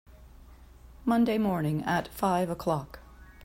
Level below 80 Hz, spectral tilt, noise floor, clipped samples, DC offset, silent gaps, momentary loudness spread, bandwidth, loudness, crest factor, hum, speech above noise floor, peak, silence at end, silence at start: -52 dBFS; -7 dB/octave; -51 dBFS; under 0.1%; under 0.1%; none; 9 LU; 16 kHz; -29 LUFS; 16 dB; none; 24 dB; -14 dBFS; 0 s; 0.15 s